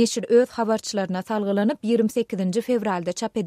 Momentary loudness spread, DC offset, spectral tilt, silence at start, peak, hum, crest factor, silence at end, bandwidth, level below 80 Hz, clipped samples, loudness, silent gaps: 7 LU; under 0.1%; -5.5 dB/octave; 0 s; -6 dBFS; none; 16 dB; 0 s; 15 kHz; -66 dBFS; under 0.1%; -23 LUFS; none